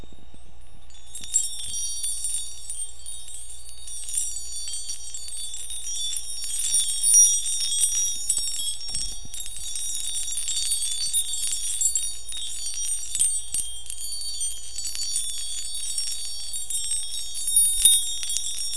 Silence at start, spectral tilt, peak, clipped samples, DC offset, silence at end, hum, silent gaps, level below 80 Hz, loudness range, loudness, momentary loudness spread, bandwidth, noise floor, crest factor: 0 s; 2 dB/octave; -2 dBFS; under 0.1%; 4%; 0 s; none; none; -48 dBFS; 9 LU; -23 LUFS; 15 LU; 11 kHz; -47 dBFS; 26 dB